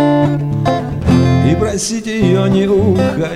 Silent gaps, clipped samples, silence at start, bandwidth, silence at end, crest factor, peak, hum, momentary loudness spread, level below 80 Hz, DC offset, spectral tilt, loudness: none; under 0.1%; 0 s; 13 kHz; 0 s; 12 dB; 0 dBFS; none; 5 LU; -32 dBFS; 0.5%; -6.5 dB/octave; -13 LUFS